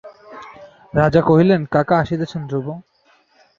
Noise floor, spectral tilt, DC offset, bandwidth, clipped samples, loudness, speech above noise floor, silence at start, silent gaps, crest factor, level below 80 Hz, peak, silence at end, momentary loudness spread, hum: -56 dBFS; -8.5 dB/octave; under 0.1%; 7.2 kHz; under 0.1%; -17 LUFS; 39 dB; 0.05 s; none; 18 dB; -46 dBFS; 0 dBFS; 0.8 s; 23 LU; none